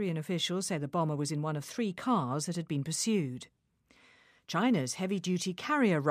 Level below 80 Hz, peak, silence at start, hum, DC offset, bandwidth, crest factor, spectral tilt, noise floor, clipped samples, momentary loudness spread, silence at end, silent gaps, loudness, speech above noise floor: -76 dBFS; -14 dBFS; 0 s; none; under 0.1%; 15 kHz; 18 dB; -5 dB/octave; -65 dBFS; under 0.1%; 6 LU; 0 s; none; -32 LUFS; 34 dB